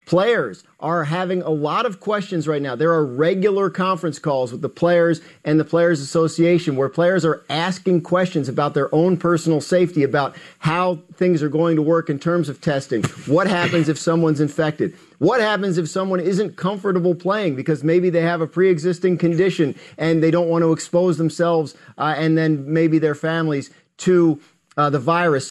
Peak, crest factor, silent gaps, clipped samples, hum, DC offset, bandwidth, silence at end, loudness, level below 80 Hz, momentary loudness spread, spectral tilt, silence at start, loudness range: -6 dBFS; 12 dB; none; under 0.1%; none; under 0.1%; 12 kHz; 0 s; -19 LUFS; -62 dBFS; 6 LU; -6.5 dB/octave; 0.1 s; 2 LU